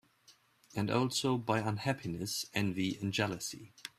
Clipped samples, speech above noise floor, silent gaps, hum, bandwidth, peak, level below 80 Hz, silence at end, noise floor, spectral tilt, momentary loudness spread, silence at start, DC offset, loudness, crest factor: under 0.1%; 31 dB; none; none; 15.5 kHz; -14 dBFS; -68 dBFS; 0.1 s; -66 dBFS; -4.5 dB/octave; 9 LU; 0.3 s; under 0.1%; -35 LUFS; 20 dB